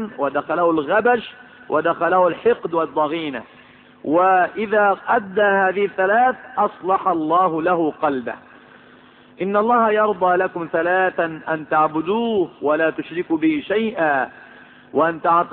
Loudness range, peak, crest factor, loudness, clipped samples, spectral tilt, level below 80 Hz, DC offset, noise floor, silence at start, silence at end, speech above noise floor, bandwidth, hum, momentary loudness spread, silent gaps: 3 LU; -4 dBFS; 14 dB; -19 LUFS; under 0.1%; -10.5 dB/octave; -62 dBFS; under 0.1%; -48 dBFS; 0 s; 0 s; 29 dB; 4.3 kHz; none; 8 LU; none